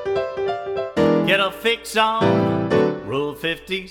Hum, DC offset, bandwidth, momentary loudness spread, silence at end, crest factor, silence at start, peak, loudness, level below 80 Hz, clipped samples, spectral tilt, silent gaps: none; under 0.1%; 18 kHz; 8 LU; 0 s; 16 dB; 0 s; -4 dBFS; -20 LUFS; -52 dBFS; under 0.1%; -5.5 dB/octave; none